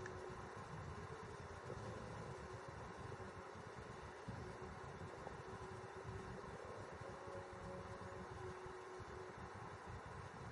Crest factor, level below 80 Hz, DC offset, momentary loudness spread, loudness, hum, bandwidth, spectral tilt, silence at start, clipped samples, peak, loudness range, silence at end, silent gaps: 16 dB; -66 dBFS; under 0.1%; 2 LU; -53 LUFS; none; 11 kHz; -6 dB/octave; 0 s; under 0.1%; -36 dBFS; 1 LU; 0 s; none